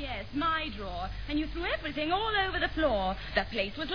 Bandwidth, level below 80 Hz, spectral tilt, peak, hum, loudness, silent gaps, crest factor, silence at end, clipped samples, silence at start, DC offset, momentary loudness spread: 5.4 kHz; -42 dBFS; -6.5 dB/octave; -10 dBFS; 50 Hz at -45 dBFS; -31 LUFS; none; 20 dB; 0 s; under 0.1%; 0 s; 0.4%; 8 LU